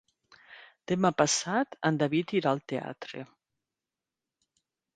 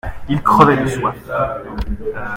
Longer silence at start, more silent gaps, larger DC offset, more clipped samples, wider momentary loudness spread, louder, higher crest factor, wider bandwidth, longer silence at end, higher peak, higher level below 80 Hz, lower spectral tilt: first, 0.5 s vs 0.05 s; neither; neither; neither; first, 17 LU vs 14 LU; second, -28 LUFS vs -17 LUFS; first, 24 dB vs 16 dB; second, 9.8 kHz vs 16.5 kHz; first, 1.7 s vs 0 s; second, -8 dBFS vs 0 dBFS; second, -72 dBFS vs -32 dBFS; second, -4.5 dB/octave vs -7 dB/octave